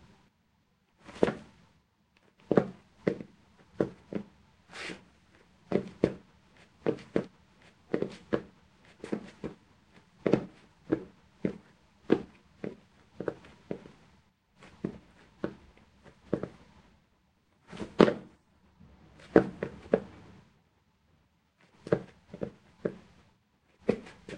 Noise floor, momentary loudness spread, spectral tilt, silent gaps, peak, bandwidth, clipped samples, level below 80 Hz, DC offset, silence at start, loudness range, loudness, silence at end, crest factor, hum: -71 dBFS; 22 LU; -7.5 dB/octave; none; -2 dBFS; 10.5 kHz; under 0.1%; -62 dBFS; under 0.1%; 1.1 s; 12 LU; -34 LUFS; 0 s; 34 dB; none